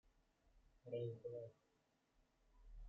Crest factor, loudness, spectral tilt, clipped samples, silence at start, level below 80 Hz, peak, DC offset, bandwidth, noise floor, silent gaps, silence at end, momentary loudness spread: 20 dB; -51 LUFS; -8.5 dB/octave; under 0.1%; 0.05 s; -68 dBFS; -36 dBFS; under 0.1%; 7.2 kHz; -83 dBFS; none; 0 s; 18 LU